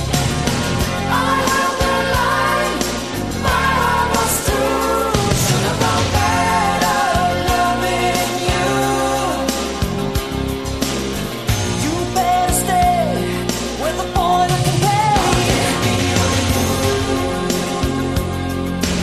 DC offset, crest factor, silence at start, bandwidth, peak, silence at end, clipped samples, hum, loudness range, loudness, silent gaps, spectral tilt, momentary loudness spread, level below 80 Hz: 0.4%; 16 dB; 0 s; 14 kHz; -2 dBFS; 0 s; under 0.1%; none; 3 LU; -17 LUFS; none; -4 dB/octave; 6 LU; -30 dBFS